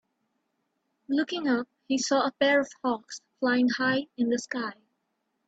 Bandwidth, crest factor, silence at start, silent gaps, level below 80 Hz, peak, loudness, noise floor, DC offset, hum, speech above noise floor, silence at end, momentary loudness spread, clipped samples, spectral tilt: 8 kHz; 20 dB; 1.1 s; none; -74 dBFS; -10 dBFS; -27 LUFS; -78 dBFS; under 0.1%; none; 51 dB; 0.75 s; 10 LU; under 0.1%; -3 dB/octave